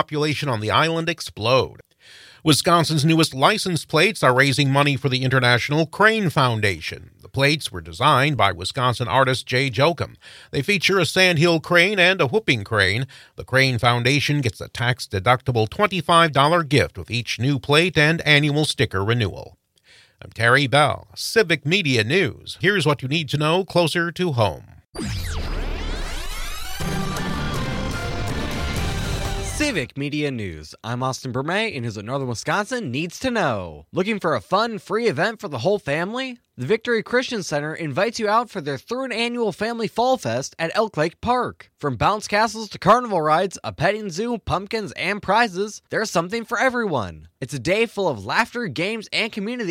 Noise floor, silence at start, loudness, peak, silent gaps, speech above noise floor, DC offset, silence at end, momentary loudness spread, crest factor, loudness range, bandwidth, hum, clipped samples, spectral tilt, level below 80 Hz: -54 dBFS; 0 s; -21 LUFS; 0 dBFS; none; 33 dB; under 0.1%; 0 s; 12 LU; 20 dB; 7 LU; 16.5 kHz; none; under 0.1%; -4.5 dB/octave; -40 dBFS